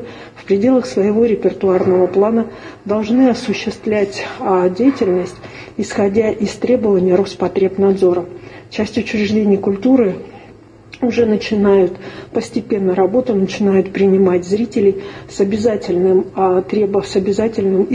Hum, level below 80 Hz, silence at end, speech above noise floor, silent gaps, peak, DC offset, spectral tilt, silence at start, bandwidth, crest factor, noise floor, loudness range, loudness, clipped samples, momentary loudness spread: none; -48 dBFS; 0 s; 26 dB; none; 0 dBFS; under 0.1%; -7 dB/octave; 0 s; 9.8 kHz; 16 dB; -40 dBFS; 2 LU; -15 LUFS; under 0.1%; 10 LU